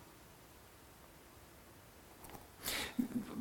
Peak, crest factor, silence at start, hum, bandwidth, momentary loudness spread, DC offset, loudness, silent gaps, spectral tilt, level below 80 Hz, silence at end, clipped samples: -20 dBFS; 26 dB; 0 s; none; 19 kHz; 20 LU; under 0.1%; -42 LUFS; none; -3 dB/octave; -66 dBFS; 0 s; under 0.1%